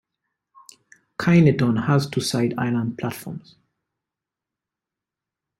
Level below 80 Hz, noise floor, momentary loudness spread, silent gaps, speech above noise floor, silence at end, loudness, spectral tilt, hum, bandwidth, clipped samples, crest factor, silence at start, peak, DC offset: -58 dBFS; -87 dBFS; 19 LU; none; 67 dB; 2.2 s; -21 LUFS; -6.5 dB/octave; none; 14 kHz; under 0.1%; 20 dB; 1.2 s; -4 dBFS; under 0.1%